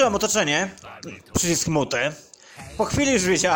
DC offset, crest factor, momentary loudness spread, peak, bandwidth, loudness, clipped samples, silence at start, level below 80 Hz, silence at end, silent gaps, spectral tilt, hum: under 0.1%; 16 dB; 20 LU; -8 dBFS; 17 kHz; -22 LUFS; under 0.1%; 0 s; -46 dBFS; 0 s; none; -3 dB/octave; none